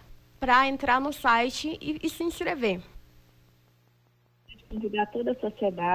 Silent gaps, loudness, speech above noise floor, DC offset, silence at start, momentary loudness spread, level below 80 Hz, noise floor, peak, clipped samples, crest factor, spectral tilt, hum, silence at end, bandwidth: none; -27 LUFS; 38 dB; under 0.1%; 0.1 s; 11 LU; -54 dBFS; -65 dBFS; -12 dBFS; under 0.1%; 18 dB; -4 dB/octave; 60 Hz at -60 dBFS; 0 s; 16 kHz